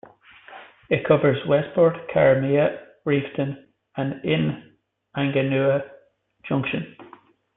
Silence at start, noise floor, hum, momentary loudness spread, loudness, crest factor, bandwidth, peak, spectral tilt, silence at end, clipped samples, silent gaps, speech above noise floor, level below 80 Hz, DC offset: 0.5 s; -56 dBFS; none; 19 LU; -22 LUFS; 20 dB; 4 kHz; -4 dBFS; -11.5 dB/octave; 0.55 s; under 0.1%; none; 35 dB; -60 dBFS; under 0.1%